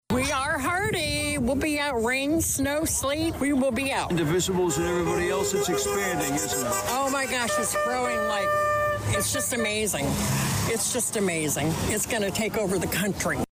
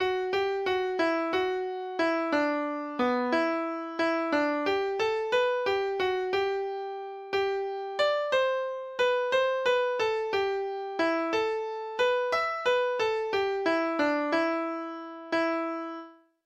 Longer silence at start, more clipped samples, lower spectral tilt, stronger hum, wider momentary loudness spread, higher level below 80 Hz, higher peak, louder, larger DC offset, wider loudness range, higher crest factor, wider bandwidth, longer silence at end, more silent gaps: about the same, 0.1 s vs 0 s; neither; about the same, -3.5 dB/octave vs -3.5 dB/octave; neither; second, 2 LU vs 7 LU; first, -44 dBFS vs -66 dBFS; about the same, -16 dBFS vs -14 dBFS; first, -25 LUFS vs -28 LUFS; neither; about the same, 0 LU vs 1 LU; about the same, 10 dB vs 14 dB; first, 16 kHz vs 12.5 kHz; second, 0.05 s vs 0.3 s; neither